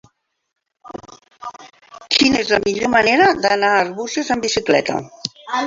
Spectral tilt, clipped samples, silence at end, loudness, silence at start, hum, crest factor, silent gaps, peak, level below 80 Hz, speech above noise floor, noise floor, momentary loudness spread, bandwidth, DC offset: -3 dB/octave; under 0.1%; 0 s; -16 LUFS; 0.85 s; none; 18 dB; none; 0 dBFS; -52 dBFS; 20 dB; -37 dBFS; 21 LU; 7.8 kHz; under 0.1%